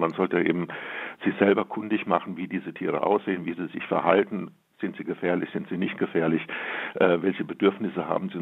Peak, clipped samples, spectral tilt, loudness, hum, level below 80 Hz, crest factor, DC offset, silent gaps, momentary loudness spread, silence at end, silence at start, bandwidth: -4 dBFS; under 0.1%; -8.5 dB/octave; -26 LUFS; none; -74 dBFS; 22 dB; under 0.1%; none; 10 LU; 0 s; 0 s; 4.3 kHz